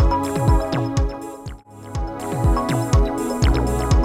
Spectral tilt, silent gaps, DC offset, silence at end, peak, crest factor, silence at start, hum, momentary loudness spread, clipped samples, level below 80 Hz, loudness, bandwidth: -6.5 dB/octave; none; under 0.1%; 0 s; -8 dBFS; 12 dB; 0 s; none; 14 LU; under 0.1%; -22 dBFS; -21 LUFS; 15.5 kHz